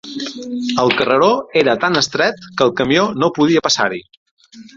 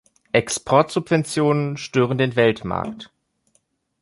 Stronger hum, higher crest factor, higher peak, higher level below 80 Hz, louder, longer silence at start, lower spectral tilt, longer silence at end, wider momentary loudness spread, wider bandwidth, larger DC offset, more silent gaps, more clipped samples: neither; about the same, 16 dB vs 20 dB; about the same, 0 dBFS vs -2 dBFS; about the same, -54 dBFS vs -54 dBFS; first, -15 LUFS vs -20 LUFS; second, 0.05 s vs 0.35 s; second, -4 dB/octave vs -5.5 dB/octave; second, 0.15 s vs 0.95 s; about the same, 10 LU vs 9 LU; second, 7.8 kHz vs 11.5 kHz; neither; first, 4.17-4.37 s vs none; neither